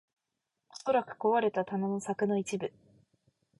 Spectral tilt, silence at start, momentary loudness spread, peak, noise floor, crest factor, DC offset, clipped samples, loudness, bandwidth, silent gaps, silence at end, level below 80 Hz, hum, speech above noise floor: -6 dB/octave; 0.75 s; 10 LU; -16 dBFS; -86 dBFS; 18 dB; under 0.1%; under 0.1%; -32 LUFS; 11.5 kHz; none; 0.9 s; -76 dBFS; none; 55 dB